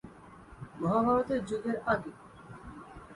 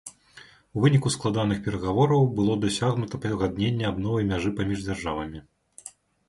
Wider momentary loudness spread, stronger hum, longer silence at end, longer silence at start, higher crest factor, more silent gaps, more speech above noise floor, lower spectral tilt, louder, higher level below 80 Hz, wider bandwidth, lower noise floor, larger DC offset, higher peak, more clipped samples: first, 24 LU vs 20 LU; neither; second, 0 s vs 0.4 s; about the same, 0.05 s vs 0.05 s; about the same, 18 dB vs 18 dB; neither; second, 22 dB vs 28 dB; about the same, -7.5 dB/octave vs -6.5 dB/octave; second, -31 LUFS vs -25 LUFS; second, -58 dBFS vs -48 dBFS; about the same, 11.5 kHz vs 11.5 kHz; about the same, -52 dBFS vs -52 dBFS; neither; second, -16 dBFS vs -8 dBFS; neither